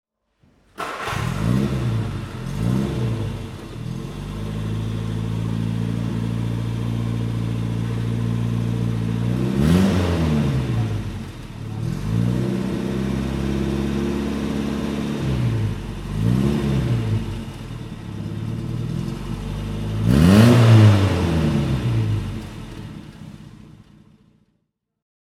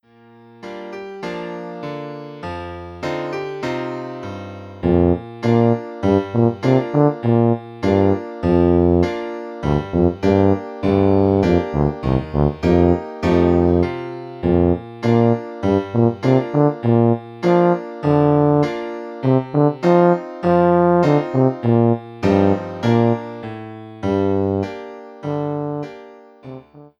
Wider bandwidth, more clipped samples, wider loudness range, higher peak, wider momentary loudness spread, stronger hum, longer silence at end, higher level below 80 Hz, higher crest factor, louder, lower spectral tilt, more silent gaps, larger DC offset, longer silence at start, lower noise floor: first, 13.5 kHz vs 7.4 kHz; neither; about the same, 10 LU vs 8 LU; about the same, -2 dBFS vs -2 dBFS; about the same, 15 LU vs 15 LU; neither; first, 1.5 s vs 0.15 s; about the same, -34 dBFS vs -38 dBFS; about the same, 20 dB vs 16 dB; second, -22 LUFS vs -18 LUFS; second, -7.5 dB/octave vs -9 dB/octave; neither; neither; first, 0.8 s vs 0.6 s; first, -72 dBFS vs -47 dBFS